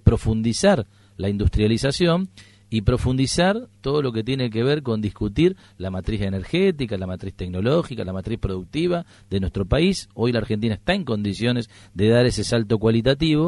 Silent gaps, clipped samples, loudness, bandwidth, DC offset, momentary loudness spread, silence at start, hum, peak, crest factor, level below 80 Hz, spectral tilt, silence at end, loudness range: none; under 0.1%; -22 LUFS; 11.5 kHz; under 0.1%; 10 LU; 0.05 s; none; -4 dBFS; 18 dB; -36 dBFS; -6 dB/octave; 0 s; 3 LU